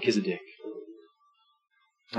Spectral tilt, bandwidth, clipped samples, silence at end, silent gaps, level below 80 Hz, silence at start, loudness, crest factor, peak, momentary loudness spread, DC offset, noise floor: -5 dB/octave; 9.2 kHz; under 0.1%; 0 s; none; under -90 dBFS; 0 s; -34 LUFS; 22 dB; -12 dBFS; 22 LU; under 0.1%; -68 dBFS